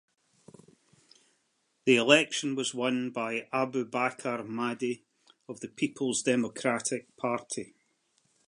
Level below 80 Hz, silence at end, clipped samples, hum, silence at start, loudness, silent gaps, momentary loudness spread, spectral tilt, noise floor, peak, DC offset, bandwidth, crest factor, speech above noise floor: -80 dBFS; 0.85 s; under 0.1%; none; 1.85 s; -29 LUFS; none; 16 LU; -3.5 dB/octave; -75 dBFS; -6 dBFS; under 0.1%; 11 kHz; 26 dB; 45 dB